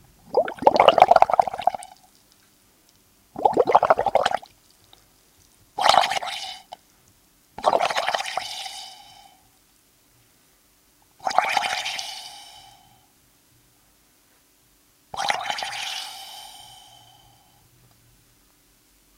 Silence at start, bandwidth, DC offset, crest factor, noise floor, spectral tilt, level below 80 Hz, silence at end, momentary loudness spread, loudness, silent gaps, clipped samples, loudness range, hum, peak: 0.35 s; 16.5 kHz; under 0.1%; 26 dB; -60 dBFS; -2 dB/octave; -62 dBFS; 2.55 s; 24 LU; -22 LUFS; none; under 0.1%; 14 LU; none; 0 dBFS